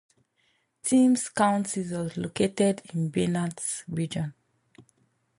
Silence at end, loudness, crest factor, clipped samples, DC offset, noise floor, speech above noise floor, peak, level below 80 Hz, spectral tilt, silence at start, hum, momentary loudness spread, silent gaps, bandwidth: 0.55 s; -27 LUFS; 18 dB; under 0.1%; under 0.1%; -71 dBFS; 45 dB; -10 dBFS; -64 dBFS; -5.5 dB/octave; 0.85 s; none; 10 LU; none; 11.5 kHz